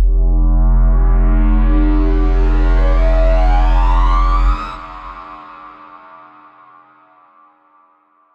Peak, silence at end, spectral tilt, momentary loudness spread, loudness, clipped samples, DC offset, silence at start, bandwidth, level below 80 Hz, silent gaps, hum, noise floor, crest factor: -4 dBFS; 2.4 s; -8.5 dB/octave; 19 LU; -16 LUFS; under 0.1%; under 0.1%; 0 s; 4.7 kHz; -14 dBFS; none; none; -54 dBFS; 8 dB